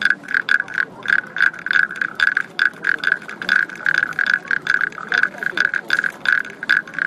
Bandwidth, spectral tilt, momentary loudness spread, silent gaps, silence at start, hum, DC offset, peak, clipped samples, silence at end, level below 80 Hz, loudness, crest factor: 14 kHz; -2 dB/octave; 3 LU; none; 0 s; none; under 0.1%; 0 dBFS; under 0.1%; 0 s; -66 dBFS; -18 LUFS; 18 dB